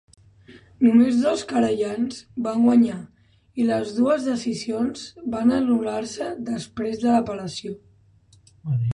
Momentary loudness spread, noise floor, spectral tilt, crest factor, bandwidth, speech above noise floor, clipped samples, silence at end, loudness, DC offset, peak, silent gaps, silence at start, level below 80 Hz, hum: 14 LU; -56 dBFS; -6.5 dB/octave; 16 dB; 10.5 kHz; 34 dB; under 0.1%; 0.05 s; -22 LUFS; under 0.1%; -8 dBFS; none; 0.5 s; -58 dBFS; none